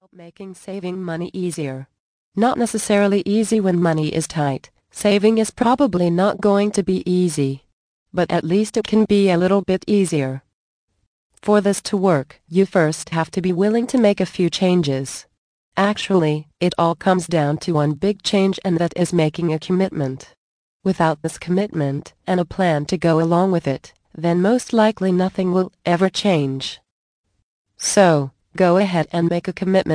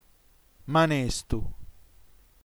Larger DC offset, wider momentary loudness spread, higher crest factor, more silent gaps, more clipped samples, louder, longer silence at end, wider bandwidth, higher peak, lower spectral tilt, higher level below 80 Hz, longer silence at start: neither; second, 11 LU vs 19 LU; about the same, 18 dB vs 18 dB; first, 2.00-2.32 s, 7.73-8.06 s, 10.53-10.88 s, 11.07-11.30 s, 15.38-15.72 s, 20.37-20.80 s, 26.91-27.24 s, 27.43-27.65 s vs none; neither; first, -19 LUFS vs -27 LUFS; second, 0 s vs 0.8 s; second, 10.5 kHz vs over 20 kHz; first, -2 dBFS vs -12 dBFS; about the same, -6 dB/octave vs -5 dB/octave; second, -54 dBFS vs -42 dBFS; second, 0.2 s vs 0.65 s